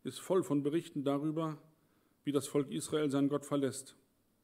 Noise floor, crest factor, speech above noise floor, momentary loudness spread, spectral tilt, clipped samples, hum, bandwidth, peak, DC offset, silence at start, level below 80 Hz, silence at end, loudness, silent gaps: -72 dBFS; 18 dB; 38 dB; 8 LU; -6 dB/octave; under 0.1%; none; 16 kHz; -18 dBFS; under 0.1%; 0.05 s; -82 dBFS; 0.55 s; -35 LUFS; none